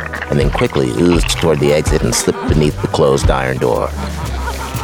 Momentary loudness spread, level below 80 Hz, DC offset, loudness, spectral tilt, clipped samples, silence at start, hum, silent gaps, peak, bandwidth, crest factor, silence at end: 9 LU; -22 dBFS; 0.2%; -15 LUFS; -5 dB/octave; under 0.1%; 0 s; none; none; -2 dBFS; over 20 kHz; 14 dB; 0 s